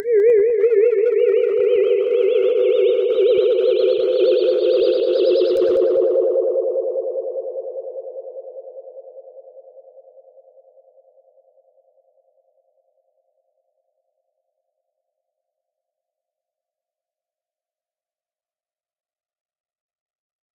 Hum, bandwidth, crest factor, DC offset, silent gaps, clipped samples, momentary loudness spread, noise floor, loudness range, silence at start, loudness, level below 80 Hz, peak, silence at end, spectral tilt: none; 5.4 kHz; 14 dB; under 0.1%; none; under 0.1%; 17 LU; under -90 dBFS; 18 LU; 0 s; -17 LUFS; -70 dBFS; -6 dBFS; 10.75 s; -6 dB/octave